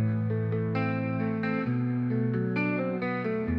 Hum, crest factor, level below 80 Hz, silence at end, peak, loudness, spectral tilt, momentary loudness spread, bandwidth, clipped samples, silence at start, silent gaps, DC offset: none; 12 dB; -56 dBFS; 0 s; -16 dBFS; -29 LUFS; -10.5 dB/octave; 2 LU; 5.4 kHz; under 0.1%; 0 s; none; under 0.1%